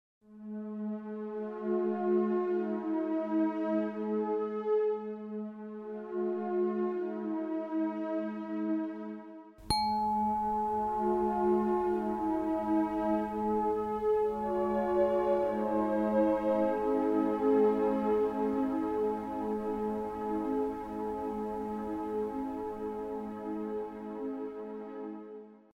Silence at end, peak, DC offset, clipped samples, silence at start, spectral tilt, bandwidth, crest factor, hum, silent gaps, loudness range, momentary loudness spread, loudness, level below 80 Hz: 0.2 s; -14 dBFS; under 0.1%; under 0.1%; 0.3 s; -7 dB/octave; 13 kHz; 18 dB; none; none; 7 LU; 12 LU; -32 LUFS; -58 dBFS